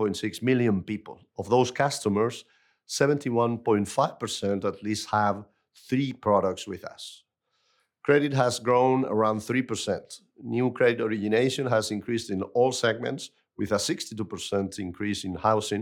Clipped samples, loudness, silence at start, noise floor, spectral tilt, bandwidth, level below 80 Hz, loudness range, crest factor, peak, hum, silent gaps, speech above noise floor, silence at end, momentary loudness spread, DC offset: under 0.1%; -26 LUFS; 0 s; -73 dBFS; -5 dB/octave; 17.5 kHz; -70 dBFS; 3 LU; 20 dB; -8 dBFS; none; none; 47 dB; 0 s; 12 LU; under 0.1%